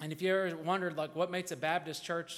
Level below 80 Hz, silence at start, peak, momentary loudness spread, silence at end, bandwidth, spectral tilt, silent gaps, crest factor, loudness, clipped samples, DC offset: -78 dBFS; 0 s; -18 dBFS; 5 LU; 0 s; 16.5 kHz; -4.5 dB/octave; none; 16 dB; -34 LUFS; under 0.1%; under 0.1%